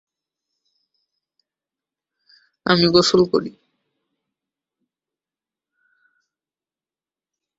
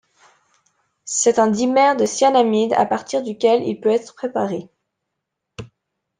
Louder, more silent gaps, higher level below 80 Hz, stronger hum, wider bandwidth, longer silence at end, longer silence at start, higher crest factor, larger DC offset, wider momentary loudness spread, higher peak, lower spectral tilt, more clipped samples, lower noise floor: about the same, -17 LUFS vs -18 LUFS; neither; first, -58 dBFS vs -64 dBFS; neither; second, 8 kHz vs 10 kHz; first, 4.1 s vs 0.55 s; first, 2.65 s vs 1.05 s; first, 24 dB vs 16 dB; neither; about the same, 14 LU vs 14 LU; about the same, 0 dBFS vs -2 dBFS; about the same, -5 dB/octave vs -4 dB/octave; neither; first, under -90 dBFS vs -79 dBFS